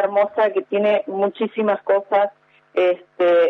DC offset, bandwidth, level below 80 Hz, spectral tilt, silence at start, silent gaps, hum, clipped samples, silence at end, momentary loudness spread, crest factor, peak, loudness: under 0.1%; 5.6 kHz; -78 dBFS; -7.5 dB/octave; 0 s; none; none; under 0.1%; 0 s; 4 LU; 12 dB; -6 dBFS; -20 LUFS